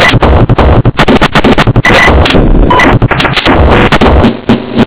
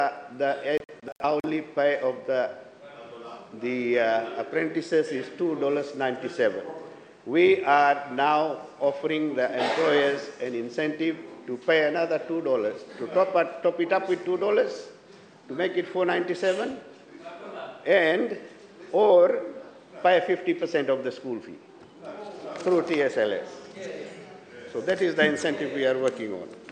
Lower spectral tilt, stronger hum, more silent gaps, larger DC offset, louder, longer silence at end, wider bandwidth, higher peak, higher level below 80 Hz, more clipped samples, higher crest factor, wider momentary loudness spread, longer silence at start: first, -10 dB/octave vs -5 dB/octave; neither; second, none vs 1.12-1.16 s; first, 5% vs under 0.1%; first, -5 LUFS vs -25 LUFS; about the same, 0 s vs 0 s; second, 4 kHz vs 9.4 kHz; first, 0 dBFS vs -6 dBFS; first, -12 dBFS vs -76 dBFS; first, 20% vs under 0.1%; second, 4 dB vs 20 dB; second, 3 LU vs 19 LU; about the same, 0 s vs 0 s